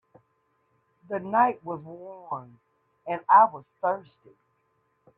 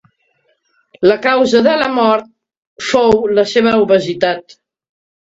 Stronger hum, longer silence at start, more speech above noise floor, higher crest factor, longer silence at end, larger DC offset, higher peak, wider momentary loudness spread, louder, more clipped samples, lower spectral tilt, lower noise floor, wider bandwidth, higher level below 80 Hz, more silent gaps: neither; about the same, 1.1 s vs 1 s; about the same, 46 dB vs 49 dB; first, 22 dB vs 14 dB; first, 1.2 s vs 0.9 s; neither; second, -6 dBFS vs 0 dBFS; first, 20 LU vs 6 LU; second, -24 LUFS vs -13 LUFS; neither; first, -9 dB/octave vs -5 dB/octave; first, -71 dBFS vs -61 dBFS; second, 3.9 kHz vs 8 kHz; second, -76 dBFS vs -50 dBFS; second, none vs 2.57-2.76 s